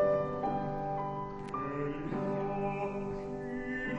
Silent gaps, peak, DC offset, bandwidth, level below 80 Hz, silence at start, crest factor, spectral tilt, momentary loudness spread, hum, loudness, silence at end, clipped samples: none; -18 dBFS; under 0.1%; 9.4 kHz; -54 dBFS; 0 s; 16 dB; -8.5 dB/octave; 5 LU; none; -36 LUFS; 0 s; under 0.1%